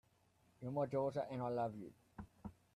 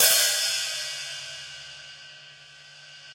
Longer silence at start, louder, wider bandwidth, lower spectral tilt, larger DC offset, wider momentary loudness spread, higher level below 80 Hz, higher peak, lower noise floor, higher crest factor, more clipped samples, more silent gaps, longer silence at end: first, 0.6 s vs 0 s; second, -42 LUFS vs -24 LUFS; second, 12.5 kHz vs 16.5 kHz; first, -8.5 dB/octave vs 2.5 dB/octave; neither; second, 18 LU vs 26 LU; about the same, -72 dBFS vs -72 dBFS; second, -28 dBFS vs -4 dBFS; first, -75 dBFS vs -49 dBFS; second, 16 dB vs 24 dB; neither; neither; first, 0.25 s vs 0 s